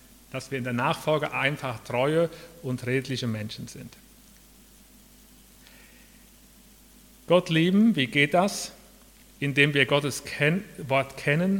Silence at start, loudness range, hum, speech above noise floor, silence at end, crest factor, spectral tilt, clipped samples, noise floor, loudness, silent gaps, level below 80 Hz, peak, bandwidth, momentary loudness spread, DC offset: 0.35 s; 11 LU; 50 Hz at -60 dBFS; 28 dB; 0 s; 22 dB; -5 dB/octave; under 0.1%; -54 dBFS; -25 LUFS; none; -58 dBFS; -4 dBFS; 18 kHz; 16 LU; under 0.1%